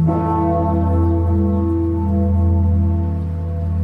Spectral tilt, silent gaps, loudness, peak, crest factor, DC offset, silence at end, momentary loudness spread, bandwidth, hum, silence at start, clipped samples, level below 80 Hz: -12 dB/octave; none; -18 LUFS; -6 dBFS; 10 dB; under 0.1%; 0 s; 5 LU; 2.4 kHz; none; 0 s; under 0.1%; -26 dBFS